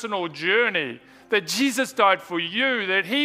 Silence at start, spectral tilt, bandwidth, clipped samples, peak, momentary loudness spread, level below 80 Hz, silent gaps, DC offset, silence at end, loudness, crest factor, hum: 0 s; -2.5 dB/octave; 16 kHz; under 0.1%; -4 dBFS; 7 LU; -72 dBFS; none; under 0.1%; 0 s; -22 LUFS; 20 dB; none